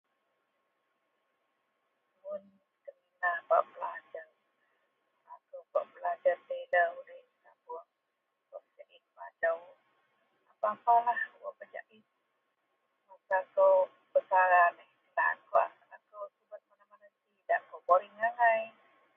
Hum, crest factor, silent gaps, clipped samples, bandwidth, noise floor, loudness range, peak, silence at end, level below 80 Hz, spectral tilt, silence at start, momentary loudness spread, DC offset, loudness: none; 22 dB; none; under 0.1%; 3.8 kHz; -83 dBFS; 10 LU; -12 dBFS; 0.45 s; under -90 dBFS; -5 dB/octave; 2.25 s; 22 LU; under 0.1%; -30 LUFS